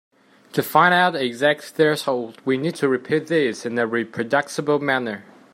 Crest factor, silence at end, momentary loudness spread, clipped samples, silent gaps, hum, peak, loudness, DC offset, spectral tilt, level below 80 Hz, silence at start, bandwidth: 20 dB; 0.3 s; 9 LU; under 0.1%; none; none; -2 dBFS; -21 LUFS; under 0.1%; -5 dB/octave; -70 dBFS; 0.55 s; 16 kHz